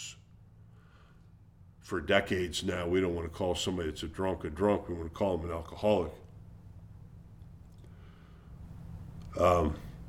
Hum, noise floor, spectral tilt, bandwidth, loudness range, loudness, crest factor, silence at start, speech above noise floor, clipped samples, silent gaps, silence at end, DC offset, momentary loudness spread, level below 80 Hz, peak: none; -57 dBFS; -5.5 dB/octave; 16.5 kHz; 6 LU; -32 LUFS; 24 dB; 0 s; 26 dB; under 0.1%; none; 0 s; under 0.1%; 25 LU; -50 dBFS; -10 dBFS